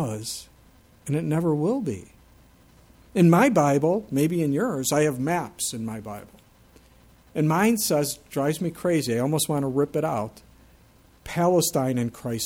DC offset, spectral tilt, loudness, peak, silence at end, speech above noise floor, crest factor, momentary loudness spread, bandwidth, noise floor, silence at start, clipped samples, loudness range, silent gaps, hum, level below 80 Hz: under 0.1%; -5.5 dB/octave; -24 LUFS; -6 dBFS; 0 s; 32 dB; 18 dB; 13 LU; 17 kHz; -55 dBFS; 0 s; under 0.1%; 4 LU; none; none; -56 dBFS